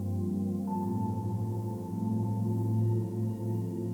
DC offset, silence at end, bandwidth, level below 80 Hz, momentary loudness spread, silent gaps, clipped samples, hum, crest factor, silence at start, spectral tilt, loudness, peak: under 0.1%; 0 s; 15 kHz; -66 dBFS; 5 LU; none; under 0.1%; none; 12 dB; 0 s; -10 dB/octave; -32 LUFS; -20 dBFS